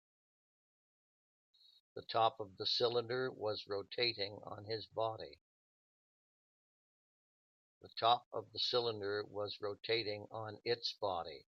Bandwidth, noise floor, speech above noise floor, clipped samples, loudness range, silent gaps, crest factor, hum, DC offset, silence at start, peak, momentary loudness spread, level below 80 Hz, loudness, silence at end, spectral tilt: 7.4 kHz; under -90 dBFS; over 51 dB; under 0.1%; 9 LU; 5.41-7.81 s, 8.26-8.31 s; 24 dB; none; under 0.1%; 1.95 s; -16 dBFS; 11 LU; -84 dBFS; -39 LUFS; 0.15 s; -4.5 dB/octave